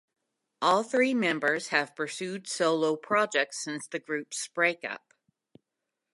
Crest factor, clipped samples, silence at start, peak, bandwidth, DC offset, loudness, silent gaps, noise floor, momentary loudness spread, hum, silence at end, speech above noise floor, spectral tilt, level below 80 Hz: 22 dB; under 0.1%; 0.6 s; -8 dBFS; 11.5 kHz; under 0.1%; -28 LUFS; none; -86 dBFS; 10 LU; none; 1.15 s; 57 dB; -3 dB/octave; -86 dBFS